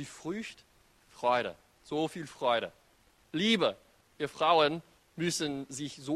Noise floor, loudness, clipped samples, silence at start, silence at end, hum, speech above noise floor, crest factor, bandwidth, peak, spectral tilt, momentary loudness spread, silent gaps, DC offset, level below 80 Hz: -65 dBFS; -32 LUFS; under 0.1%; 0 s; 0 s; none; 34 dB; 20 dB; 13.5 kHz; -12 dBFS; -4 dB/octave; 14 LU; none; under 0.1%; -70 dBFS